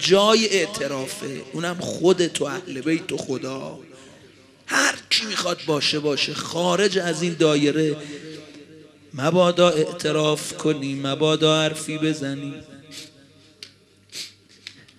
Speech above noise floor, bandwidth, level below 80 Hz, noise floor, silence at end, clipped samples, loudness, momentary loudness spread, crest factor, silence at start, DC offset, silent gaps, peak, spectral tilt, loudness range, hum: 30 dB; 14.5 kHz; -66 dBFS; -52 dBFS; 0.25 s; under 0.1%; -21 LUFS; 21 LU; 20 dB; 0 s; under 0.1%; none; -4 dBFS; -4 dB/octave; 5 LU; none